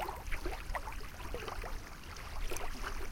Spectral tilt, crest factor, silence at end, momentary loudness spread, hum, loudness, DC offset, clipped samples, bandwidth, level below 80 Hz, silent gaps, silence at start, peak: -3.5 dB/octave; 16 dB; 0 s; 5 LU; none; -43 LUFS; under 0.1%; under 0.1%; 17 kHz; -42 dBFS; none; 0 s; -22 dBFS